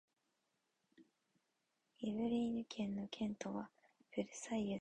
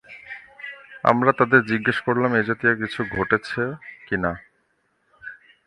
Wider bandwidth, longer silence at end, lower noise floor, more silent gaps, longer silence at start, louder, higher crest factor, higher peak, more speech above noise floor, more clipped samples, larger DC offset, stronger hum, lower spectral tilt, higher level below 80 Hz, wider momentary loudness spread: second, 9 kHz vs 11.5 kHz; second, 0 s vs 0.3 s; first, -86 dBFS vs -68 dBFS; neither; first, 1 s vs 0.1 s; second, -43 LUFS vs -21 LUFS; about the same, 18 dB vs 22 dB; second, -26 dBFS vs 0 dBFS; about the same, 44 dB vs 47 dB; neither; neither; neither; second, -5.5 dB/octave vs -7 dB/octave; second, -76 dBFS vs -52 dBFS; second, 9 LU vs 21 LU